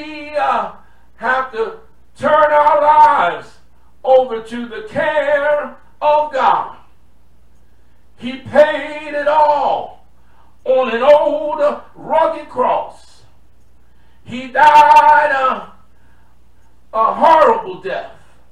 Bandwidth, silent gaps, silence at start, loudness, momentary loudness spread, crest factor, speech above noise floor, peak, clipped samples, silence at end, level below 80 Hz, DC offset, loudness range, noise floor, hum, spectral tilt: 10.5 kHz; none; 0 s; -14 LUFS; 17 LU; 16 dB; 39 dB; 0 dBFS; under 0.1%; 0.45 s; -50 dBFS; 1%; 5 LU; -52 dBFS; none; -4.5 dB/octave